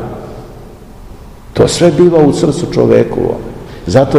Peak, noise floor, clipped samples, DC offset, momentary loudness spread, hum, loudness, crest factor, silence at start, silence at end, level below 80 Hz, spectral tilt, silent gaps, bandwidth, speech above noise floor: 0 dBFS; -32 dBFS; 2%; 0.5%; 20 LU; none; -10 LUFS; 12 dB; 0 s; 0 s; -34 dBFS; -6.5 dB/octave; none; 12 kHz; 23 dB